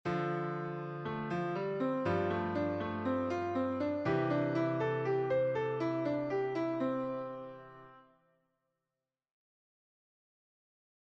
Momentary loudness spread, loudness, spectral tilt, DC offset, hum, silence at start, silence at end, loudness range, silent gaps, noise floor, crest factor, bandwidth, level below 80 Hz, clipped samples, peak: 8 LU; -35 LUFS; -8.5 dB/octave; under 0.1%; none; 0.05 s; 3.05 s; 8 LU; none; under -90 dBFS; 14 dB; 7.8 kHz; -70 dBFS; under 0.1%; -22 dBFS